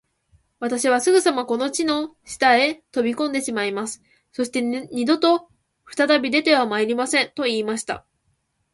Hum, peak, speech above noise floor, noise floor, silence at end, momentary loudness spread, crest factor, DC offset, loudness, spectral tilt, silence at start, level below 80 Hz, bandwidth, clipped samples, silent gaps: none; -4 dBFS; 49 dB; -69 dBFS; 0.75 s; 12 LU; 18 dB; under 0.1%; -21 LUFS; -2.5 dB/octave; 0.6 s; -64 dBFS; 11.5 kHz; under 0.1%; none